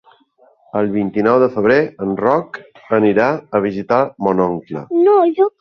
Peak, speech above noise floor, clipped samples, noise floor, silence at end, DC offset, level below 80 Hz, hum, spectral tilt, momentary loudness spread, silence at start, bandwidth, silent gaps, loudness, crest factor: -2 dBFS; 38 dB; under 0.1%; -53 dBFS; 0.1 s; under 0.1%; -54 dBFS; none; -8.5 dB/octave; 8 LU; 0.75 s; 6.2 kHz; none; -16 LUFS; 14 dB